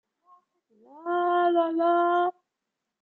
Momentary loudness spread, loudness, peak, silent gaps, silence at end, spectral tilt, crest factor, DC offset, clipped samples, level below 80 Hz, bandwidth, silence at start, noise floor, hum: 8 LU; -24 LUFS; -14 dBFS; none; 0.7 s; -6 dB/octave; 14 dB; under 0.1%; under 0.1%; under -90 dBFS; 4.3 kHz; 0.95 s; -85 dBFS; none